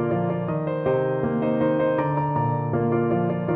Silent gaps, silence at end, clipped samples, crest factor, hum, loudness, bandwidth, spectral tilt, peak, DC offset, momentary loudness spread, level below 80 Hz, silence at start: none; 0 s; under 0.1%; 14 dB; none; -23 LUFS; 3.9 kHz; -12 dB/octave; -10 dBFS; under 0.1%; 3 LU; -54 dBFS; 0 s